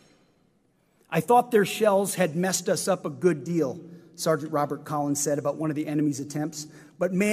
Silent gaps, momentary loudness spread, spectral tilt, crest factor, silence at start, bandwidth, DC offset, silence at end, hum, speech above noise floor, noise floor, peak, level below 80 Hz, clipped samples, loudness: none; 10 LU; -5 dB/octave; 18 dB; 1.1 s; 15.5 kHz; under 0.1%; 0 s; none; 41 dB; -66 dBFS; -8 dBFS; -72 dBFS; under 0.1%; -26 LUFS